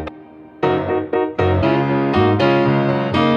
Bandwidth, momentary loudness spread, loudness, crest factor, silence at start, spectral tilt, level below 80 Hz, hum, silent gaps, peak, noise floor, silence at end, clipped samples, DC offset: 7 kHz; 5 LU; -17 LUFS; 14 dB; 0 s; -8.5 dB/octave; -44 dBFS; none; none; -2 dBFS; -39 dBFS; 0 s; under 0.1%; under 0.1%